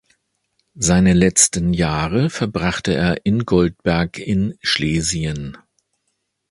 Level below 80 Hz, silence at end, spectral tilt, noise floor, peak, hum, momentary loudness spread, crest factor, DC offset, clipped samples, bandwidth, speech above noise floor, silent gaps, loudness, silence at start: -36 dBFS; 0.95 s; -4.5 dB/octave; -72 dBFS; 0 dBFS; none; 8 LU; 18 dB; under 0.1%; under 0.1%; 11.5 kHz; 55 dB; none; -18 LUFS; 0.75 s